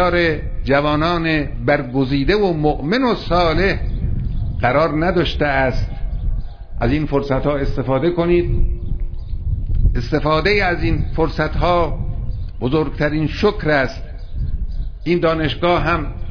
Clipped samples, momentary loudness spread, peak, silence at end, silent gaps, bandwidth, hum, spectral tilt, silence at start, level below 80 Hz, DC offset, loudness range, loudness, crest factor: under 0.1%; 10 LU; -2 dBFS; 0 s; none; 5.4 kHz; none; -8 dB/octave; 0 s; -24 dBFS; under 0.1%; 2 LU; -19 LUFS; 14 dB